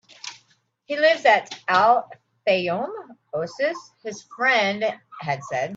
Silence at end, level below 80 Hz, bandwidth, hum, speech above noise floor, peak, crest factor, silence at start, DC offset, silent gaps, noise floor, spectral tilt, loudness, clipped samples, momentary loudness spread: 0 s; -72 dBFS; 8 kHz; none; 42 dB; -4 dBFS; 20 dB; 0.25 s; under 0.1%; none; -64 dBFS; -4 dB/octave; -22 LUFS; under 0.1%; 18 LU